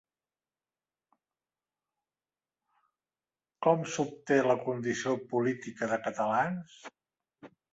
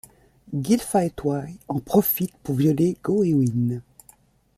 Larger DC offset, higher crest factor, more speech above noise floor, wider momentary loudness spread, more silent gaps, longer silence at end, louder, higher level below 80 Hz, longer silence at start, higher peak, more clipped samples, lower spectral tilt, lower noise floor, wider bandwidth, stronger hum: neither; first, 24 dB vs 18 dB; first, over 60 dB vs 34 dB; about the same, 8 LU vs 10 LU; neither; second, 0.25 s vs 0.75 s; second, -31 LUFS vs -23 LUFS; second, -76 dBFS vs -54 dBFS; first, 3.6 s vs 0.5 s; second, -10 dBFS vs -6 dBFS; neither; second, -5.5 dB/octave vs -7 dB/octave; first, under -90 dBFS vs -56 dBFS; second, 8 kHz vs 15.5 kHz; neither